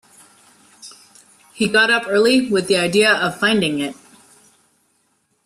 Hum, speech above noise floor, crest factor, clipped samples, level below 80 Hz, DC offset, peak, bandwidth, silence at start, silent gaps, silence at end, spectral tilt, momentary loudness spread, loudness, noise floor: none; 48 dB; 16 dB; under 0.1%; -60 dBFS; under 0.1%; -2 dBFS; 13.5 kHz; 0.85 s; none; 1.5 s; -3.5 dB/octave; 8 LU; -16 LUFS; -65 dBFS